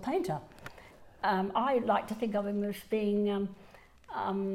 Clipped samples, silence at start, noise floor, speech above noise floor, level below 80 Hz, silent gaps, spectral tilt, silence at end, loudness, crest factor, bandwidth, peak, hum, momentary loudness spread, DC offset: under 0.1%; 0 s; -54 dBFS; 23 dB; -62 dBFS; none; -6.5 dB/octave; 0 s; -32 LUFS; 16 dB; 15.5 kHz; -16 dBFS; none; 11 LU; under 0.1%